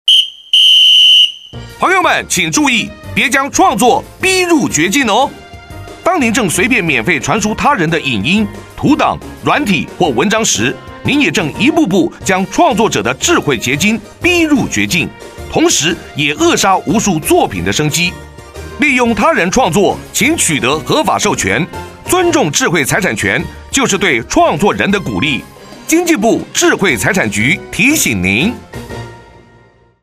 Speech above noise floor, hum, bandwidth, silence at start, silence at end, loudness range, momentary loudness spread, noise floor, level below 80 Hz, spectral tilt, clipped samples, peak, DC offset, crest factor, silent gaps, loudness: 34 dB; none; 15.5 kHz; 0.05 s; 0.8 s; 2 LU; 7 LU; -46 dBFS; -38 dBFS; -3 dB/octave; under 0.1%; 0 dBFS; under 0.1%; 12 dB; none; -11 LUFS